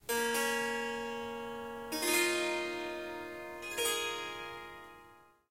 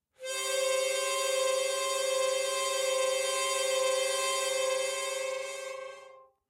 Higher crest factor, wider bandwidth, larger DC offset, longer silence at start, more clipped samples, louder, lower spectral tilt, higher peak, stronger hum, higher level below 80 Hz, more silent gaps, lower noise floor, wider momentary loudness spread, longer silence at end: about the same, 18 dB vs 14 dB; about the same, 16 kHz vs 16 kHz; neither; second, 0.05 s vs 0.2 s; neither; second, -35 LUFS vs -30 LUFS; first, -1 dB/octave vs 2 dB/octave; about the same, -18 dBFS vs -18 dBFS; neither; first, -68 dBFS vs -86 dBFS; neither; first, -60 dBFS vs -54 dBFS; first, 14 LU vs 9 LU; about the same, 0.25 s vs 0.3 s